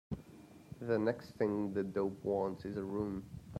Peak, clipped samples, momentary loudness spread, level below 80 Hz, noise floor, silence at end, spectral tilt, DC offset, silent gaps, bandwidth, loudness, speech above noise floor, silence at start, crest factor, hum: -20 dBFS; under 0.1%; 12 LU; -64 dBFS; -57 dBFS; 0 s; -8.5 dB/octave; under 0.1%; none; 15 kHz; -38 LUFS; 20 dB; 0.1 s; 18 dB; none